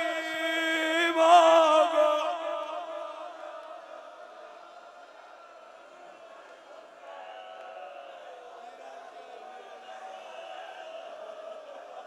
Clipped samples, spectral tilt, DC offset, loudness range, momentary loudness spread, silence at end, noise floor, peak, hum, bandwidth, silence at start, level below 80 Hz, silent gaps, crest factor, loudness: under 0.1%; -0.5 dB/octave; under 0.1%; 24 LU; 28 LU; 0 s; -50 dBFS; -8 dBFS; none; 14 kHz; 0 s; -88 dBFS; none; 22 dB; -24 LUFS